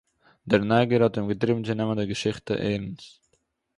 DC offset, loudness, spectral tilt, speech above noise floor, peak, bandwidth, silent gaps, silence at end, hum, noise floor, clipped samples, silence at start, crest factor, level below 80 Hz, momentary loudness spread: under 0.1%; -25 LUFS; -6.5 dB/octave; 47 dB; -6 dBFS; 11.5 kHz; none; 0.7 s; none; -72 dBFS; under 0.1%; 0.45 s; 20 dB; -56 dBFS; 9 LU